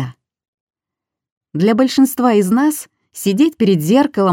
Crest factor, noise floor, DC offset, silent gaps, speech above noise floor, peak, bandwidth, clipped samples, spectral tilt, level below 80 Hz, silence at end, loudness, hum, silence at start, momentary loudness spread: 14 dB; -85 dBFS; under 0.1%; 0.48-0.67 s, 1.32-1.41 s; 71 dB; 0 dBFS; 17 kHz; under 0.1%; -6 dB/octave; -64 dBFS; 0 s; -14 LUFS; none; 0 s; 14 LU